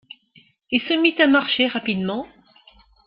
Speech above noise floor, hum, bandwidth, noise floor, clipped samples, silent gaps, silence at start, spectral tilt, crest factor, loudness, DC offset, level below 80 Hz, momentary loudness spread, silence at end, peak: 36 dB; none; 5.4 kHz; -56 dBFS; under 0.1%; none; 0.7 s; -9 dB/octave; 20 dB; -19 LUFS; under 0.1%; -62 dBFS; 12 LU; 0.8 s; -4 dBFS